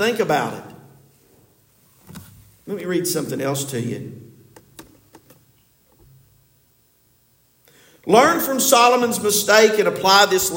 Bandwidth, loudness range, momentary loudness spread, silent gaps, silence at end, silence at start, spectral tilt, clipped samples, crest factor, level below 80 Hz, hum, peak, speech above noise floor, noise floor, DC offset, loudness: 17 kHz; 14 LU; 17 LU; none; 0 s; 0 s; -3 dB/octave; under 0.1%; 20 dB; -62 dBFS; none; 0 dBFS; 42 dB; -60 dBFS; under 0.1%; -17 LUFS